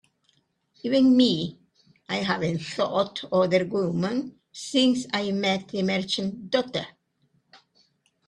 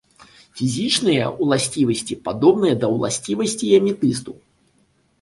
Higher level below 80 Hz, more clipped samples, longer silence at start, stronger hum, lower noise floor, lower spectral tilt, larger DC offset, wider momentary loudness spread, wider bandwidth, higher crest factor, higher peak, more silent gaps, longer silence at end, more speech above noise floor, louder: second, -66 dBFS vs -56 dBFS; neither; first, 0.85 s vs 0.55 s; neither; first, -69 dBFS vs -62 dBFS; about the same, -5.5 dB/octave vs -4.5 dB/octave; neither; about the same, 11 LU vs 10 LU; about the same, 10.5 kHz vs 11.5 kHz; about the same, 18 dB vs 18 dB; second, -8 dBFS vs -2 dBFS; neither; second, 0.7 s vs 0.9 s; about the same, 45 dB vs 43 dB; second, -25 LUFS vs -19 LUFS